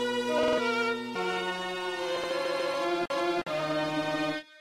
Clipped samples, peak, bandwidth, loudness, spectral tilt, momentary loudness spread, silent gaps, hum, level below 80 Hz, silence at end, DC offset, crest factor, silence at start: under 0.1%; -16 dBFS; 16 kHz; -30 LUFS; -4 dB/octave; 5 LU; none; none; -66 dBFS; 0 s; under 0.1%; 14 dB; 0 s